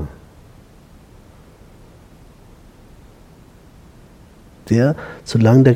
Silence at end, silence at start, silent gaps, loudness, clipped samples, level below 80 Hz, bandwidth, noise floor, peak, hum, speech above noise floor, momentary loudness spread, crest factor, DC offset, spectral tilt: 0 s; 0 s; none; -17 LUFS; under 0.1%; -46 dBFS; 12 kHz; -45 dBFS; 0 dBFS; none; 32 dB; 20 LU; 20 dB; under 0.1%; -8 dB/octave